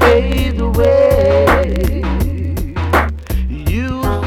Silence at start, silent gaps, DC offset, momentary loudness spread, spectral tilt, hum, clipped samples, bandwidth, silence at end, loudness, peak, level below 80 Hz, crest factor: 0 s; none; under 0.1%; 10 LU; -7 dB/octave; none; under 0.1%; 17 kHz; 0 s; -15 LUFS; -2 dBFS; -20 dBFS; 10 dB